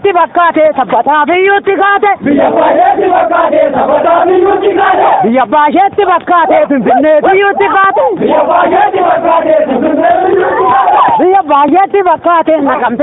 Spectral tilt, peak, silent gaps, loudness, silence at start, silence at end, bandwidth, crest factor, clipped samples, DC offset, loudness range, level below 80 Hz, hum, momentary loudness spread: -10 dB/octave; 0 dBFS; none; -8 LUFS; 0.05 s; 0 s; 4 kHz; 8 dB; under 0.1%; under 0.1%; 1 LU; -46 dBFS; none; 2 LU